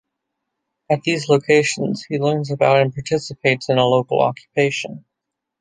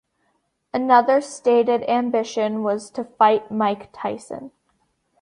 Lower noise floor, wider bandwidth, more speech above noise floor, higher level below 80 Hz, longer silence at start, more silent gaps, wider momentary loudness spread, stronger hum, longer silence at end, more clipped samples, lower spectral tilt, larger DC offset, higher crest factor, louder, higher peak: first, -81 dBFS vs -69 dBFS; about the same, 10 kHz vs 11 kHz; first, 63 dB vs 49 dB; first, -60 dBFS vs -68 dBFS; first, 0.9 s vs 0.75 s; neither; second, 8 LU vs 13 LU; neither; second, 0.6 s vs 0.75 s; neither; about the same, -5 dB/octave vs -5 dB/octave; neither; about the same, 18 dB vs 18 dB; about the same, -18 LUFS vs -20 LUFS; about the same, -2 dBFS vs -2 dBFS